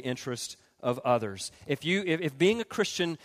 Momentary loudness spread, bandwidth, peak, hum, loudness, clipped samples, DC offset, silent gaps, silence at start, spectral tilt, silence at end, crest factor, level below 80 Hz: 10 LU; 15.5 kHz; -12 dBFS; none; -30 LUFS; under 0.1%; under 0.1%; none; 0 s; -4.5 dB/octave; 0.1 s; 18 dB; -68 dBFS